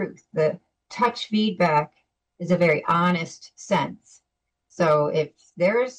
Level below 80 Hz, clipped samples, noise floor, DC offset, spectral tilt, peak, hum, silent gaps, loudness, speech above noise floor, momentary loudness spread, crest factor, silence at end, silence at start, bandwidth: -66 dBFS; under 0.1%; -80 dBFS; under 0.1%; -6 dB/octave; -10 dBFS; none; none; -23 LUFS; 57 dB; 15 LU; 14 dB; 0.05 s; 0 s; 9 kHz